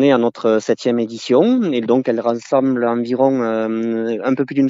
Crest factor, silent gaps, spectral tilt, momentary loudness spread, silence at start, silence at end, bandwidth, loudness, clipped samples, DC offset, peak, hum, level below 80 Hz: 16 dB; none; -6.5 dB/octave; 5 LU; 0 s; 0 s; 7.8 kHz; -17 LUFS; under 0.1%; under 0.1%; 0 dBFS; none; -70 dBFS